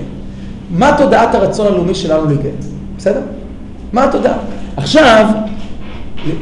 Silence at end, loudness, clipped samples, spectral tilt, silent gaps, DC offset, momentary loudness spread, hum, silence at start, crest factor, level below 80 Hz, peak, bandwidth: 0 s; -12 LUFS; under 0.1%; -6 dB/octave; none; under 0.1%; 20 LU; none; 0 s; 12 dB; -30 dBFS; 0 dBFS; 11 kHz